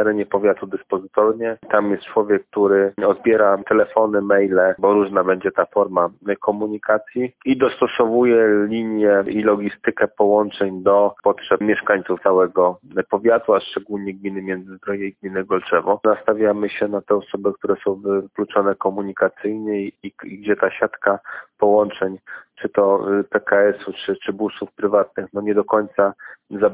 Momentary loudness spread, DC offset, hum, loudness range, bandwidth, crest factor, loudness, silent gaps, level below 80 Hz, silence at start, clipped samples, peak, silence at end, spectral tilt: 10 LU; under 0.1%; none; 4 LU; 4 kHz; 18 dB; -19 LUFS; none; -60 dBFS; 0 s; under 0.1%; -2 dBFS; 0 s; -10 dB/octave